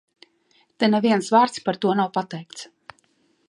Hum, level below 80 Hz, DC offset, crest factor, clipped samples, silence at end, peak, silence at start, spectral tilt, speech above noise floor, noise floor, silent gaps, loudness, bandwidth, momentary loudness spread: none; -74 dBFS; under 0.1%; 20 dB; under 0.1%; 0.85 s; -4 dBFS; 0.8 s; -5.5 dB/octave; 43 dB; -64 dBFS; none; -21 LUFS; 11.5 kHz; 20 LU